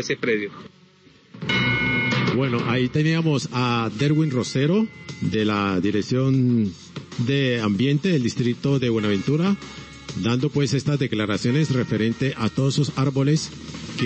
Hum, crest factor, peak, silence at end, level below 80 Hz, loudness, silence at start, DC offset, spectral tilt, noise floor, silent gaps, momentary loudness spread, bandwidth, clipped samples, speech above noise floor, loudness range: none; 12 dB; -10 dBFS; 0 s; -52 dBFS; -22 LUFS; 0 s; under 0.1%; -6 dB/octave; -53 dBFS; none; 8 LU; 8.4 kHz; under 0.1%; 31 dB; 2 LU